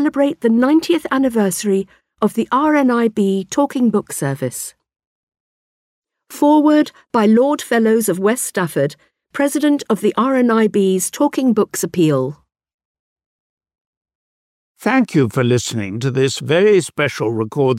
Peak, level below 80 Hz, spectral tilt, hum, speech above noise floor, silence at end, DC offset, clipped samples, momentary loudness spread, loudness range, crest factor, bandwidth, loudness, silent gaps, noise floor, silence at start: -4 dBFS; -62 dBFS; -5.5 dB/octave; none; over 75 dB; 0 s; under 0.1%; under 0.1%; 8 LU; 6 LU; 12 dB; 16 kHz; -16 LUFS; 5.06-5.27 s, 5.40-6.02 s, 12.74-12.79 s, 12.85-13.16 s, 13.26-13.57 s, 13.81-14.01 s, 14.15-14.75 s; under -90 dBFS; 0 s